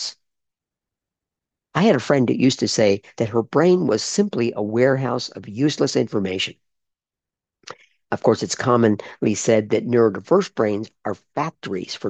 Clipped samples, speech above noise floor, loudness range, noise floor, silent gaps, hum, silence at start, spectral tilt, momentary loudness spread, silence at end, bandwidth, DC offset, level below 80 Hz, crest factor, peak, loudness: under 0.1%; 69 dB; 4 LU; -89 dBFS; none; none; 0 s; -5 dB/octave; 10 LU; 0 s; 9 kHz; under 0.1%; -64 dBFS; 18 dB; -4 dBFS; -20 LUFS